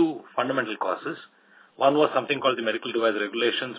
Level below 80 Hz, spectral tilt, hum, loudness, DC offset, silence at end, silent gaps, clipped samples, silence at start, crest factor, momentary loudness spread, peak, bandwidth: -80 dBFS; -8.5 dB/octave; none; -25 LUFS; under 0.1%; 0 s; none; under 0.1%; 0 s; 20 dB; 7 LU; -6 dBFS; 4 kHz